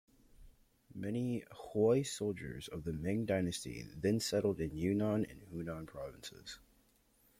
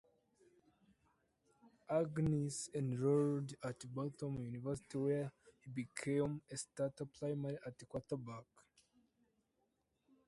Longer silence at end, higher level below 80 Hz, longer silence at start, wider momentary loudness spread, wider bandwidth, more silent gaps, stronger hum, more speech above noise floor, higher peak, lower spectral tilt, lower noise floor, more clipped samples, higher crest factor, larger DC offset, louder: second, 0.8 s vs 1.85 s; first, -62 dBFS vs -72 dBFS; second, 0.4 s vs 1.65 s; about the same, 14 LU vs 12 LU; first, 16.5 kHz vs 11.5 kHz; neither; neither; second, 34 dB vs 43 dB; first, -20 dBFS vs -24 dBFS; about the same, -6 dB/octave vs -6.5 dB/octave; second, -71 dBFS vs -84 dBFS; neither; about the same, 18 dB vs 18 dB; neither; first, -37 LUFS vs -41 LUFS